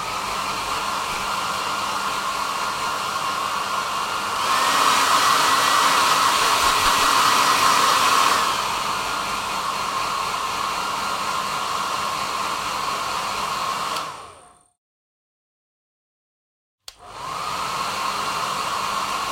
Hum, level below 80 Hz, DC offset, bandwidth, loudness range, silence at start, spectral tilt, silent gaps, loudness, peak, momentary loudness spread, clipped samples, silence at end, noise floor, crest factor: none; -52 dBFS; under 0.1%; 16.5 kHz; 13 LU; 0 s; -0.5 dB/octave; 14.78-16.78 s; -21 LUFS; -4 dBFS; 8 LU; under 0.1%; 0 s; -48 dBFS; 18 dB